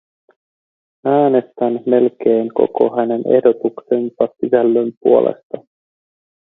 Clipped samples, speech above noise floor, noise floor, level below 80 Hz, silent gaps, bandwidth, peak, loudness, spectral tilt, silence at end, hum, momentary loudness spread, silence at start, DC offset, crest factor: under 0.1%; over 75 dB; under -90 dBFS; -64 dBFS; 4.97-5.01 s, 5.43-5.50 s; 4 kHz; 0 dBFS; -16 LUFS; -11 dB/octave; 0.9 s; none; 7 LU; 1.05 s; under 0.1%; 16 dB